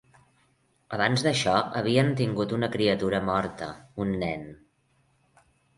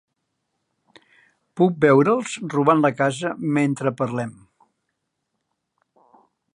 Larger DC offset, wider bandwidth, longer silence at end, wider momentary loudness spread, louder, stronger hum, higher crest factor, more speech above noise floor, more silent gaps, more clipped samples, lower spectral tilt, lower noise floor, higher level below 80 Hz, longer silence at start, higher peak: neither; about the same, 11.5 kHz vs 11 kHz; second, 1.25 s vs 2.2 s; first, 13 LU vs 10 LU; second, -26 LUFS vs -20 LUFS; neither; about the same, 22 dB vs 20 dB; second, 42 dB vs 57 dB; neither; neither; about the same, -5.5 dB/octave vs -6.5 dB/octave; second, -68 dBFS vs -77 dBFS; first, -56 dBFS vs -68 dBFS; second, 0.9 s vs 1.55 s; second, -6 dBFS vs -2 dBFS